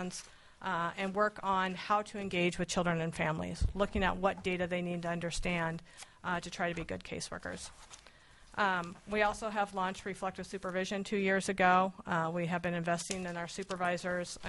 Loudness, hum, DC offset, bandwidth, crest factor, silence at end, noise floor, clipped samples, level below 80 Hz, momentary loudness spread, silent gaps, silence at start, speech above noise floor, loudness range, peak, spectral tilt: -34 LUFS; none; under 0.1%; 11.5 kHz; 20 dB; 0 s; -59 dBFS; under 0.1%; -50 dBFS; 10 LU; none; 0 s; 24 dB; 5 LU; -14 dBFS; -4.5 dB/octave